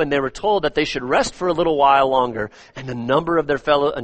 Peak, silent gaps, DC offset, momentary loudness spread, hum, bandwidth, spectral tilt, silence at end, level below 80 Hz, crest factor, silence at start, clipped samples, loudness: -2 dBFS; none; under 0.1%; 14 LU; none; 8.8 kHz; -5 dB/octave; 0 s; -44 dBFS; 16 dB; 0 s; under 0.1%; -19 LUFS